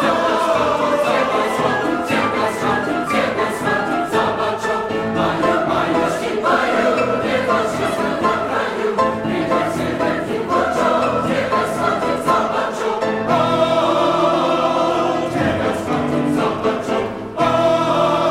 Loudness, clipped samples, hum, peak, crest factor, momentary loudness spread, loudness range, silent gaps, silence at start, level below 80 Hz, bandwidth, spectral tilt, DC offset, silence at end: -18 LUFS; under 0.1%; none; -2 dBFS; 14 dB; 4 LU; 2 LU; none; 0 s; -48 dBFS; 16 kHz; -5 dB/octave; under 0.1%; 0 s